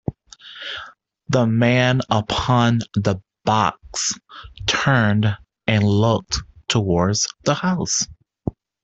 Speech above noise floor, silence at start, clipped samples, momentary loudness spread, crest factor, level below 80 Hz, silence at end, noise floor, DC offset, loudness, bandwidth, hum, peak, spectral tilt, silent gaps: 24 dB; 0.1 s; under 0.1%; 15 LU; 18 dB; -44 dBFS; 0.35 s; -42 dBFS; under 0.1%; -20 LUFS; 8.2 kHz; none; -4 dBFS; -4.5 dB/octave; none